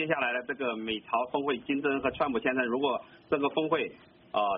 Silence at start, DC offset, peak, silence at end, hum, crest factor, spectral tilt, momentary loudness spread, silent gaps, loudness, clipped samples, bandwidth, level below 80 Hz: 0 s; under 0.1%; -14 dBFS; 0 s; none; 18 dB; -2.5 dB/octave; 5 LU; none; -30 LUFS; under 0.1%; 4.9 kHz; -64 dBFS